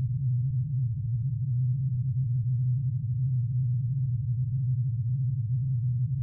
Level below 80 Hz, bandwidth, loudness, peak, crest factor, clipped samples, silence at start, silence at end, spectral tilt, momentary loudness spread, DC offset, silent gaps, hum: -52 dBFS; 0.4 kHz; -29 LUFS; -20 dBFS; 6 dB; under 0.1%; 0 s; 0 s; -19.5 dB/octave; 2 LU; under 0.1%; none; none